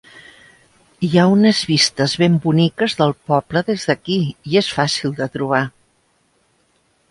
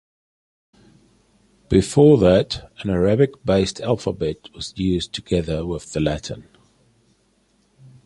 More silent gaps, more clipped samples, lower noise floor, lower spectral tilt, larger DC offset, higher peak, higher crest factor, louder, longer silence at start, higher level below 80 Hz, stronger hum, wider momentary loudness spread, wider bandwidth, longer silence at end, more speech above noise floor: neither; neither; about the same, -61 dBFS vs -62 dBFS; second, -5 dB/octave vs -6.5 dB/octave; neither; about the same, 0 dBFS vs -2 dBFS; about the same, 18 dB vs 20 dB; first, -17 LUFS vs -20 LUFS; second, 0.15 s vs 1.7 s; second, -56 dBFS vs -40 dBFS; neither; second, 7 LU vs 14 LU; about the same, 11.5 kHz vs 11.5 kHz; second, 1.4 s vs 1.65 s; about the same, 45 dB vs 43 dB